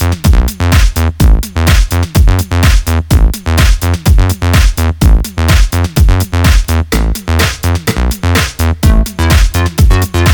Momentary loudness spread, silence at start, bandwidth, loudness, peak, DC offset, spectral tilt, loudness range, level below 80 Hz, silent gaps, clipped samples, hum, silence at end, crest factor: 3 LU; 0 s; 19.5 kHz; -11 LUFS; 0 dBFS; under 0.1%; -5 dB/octave; 1 LU; -10 dBFS; none; 0.4%; none; 0 s; 8 dB